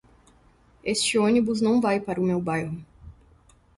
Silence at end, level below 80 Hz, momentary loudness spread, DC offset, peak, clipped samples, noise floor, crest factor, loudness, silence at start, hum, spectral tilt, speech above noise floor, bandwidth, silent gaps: 0.65 s; -56 dBFS; 12 LU; under 0.1%; -10 dBFS; under 0.1%; -58 dBFS; 16 dB; -24 LUFS; 0.85 s; none; -4.5 dB/octave; 35 dB; 11.5 kHz; none